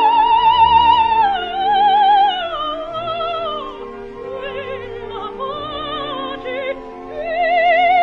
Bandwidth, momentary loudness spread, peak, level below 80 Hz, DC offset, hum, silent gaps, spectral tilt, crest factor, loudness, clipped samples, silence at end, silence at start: 6 kHz; 17 LU; -2 dBFS; -44 dBFS; under 0.1%; none; none; -5 dB/octave; 14 dB; -16 LUFS; under 0.1%; 0 s; 0 s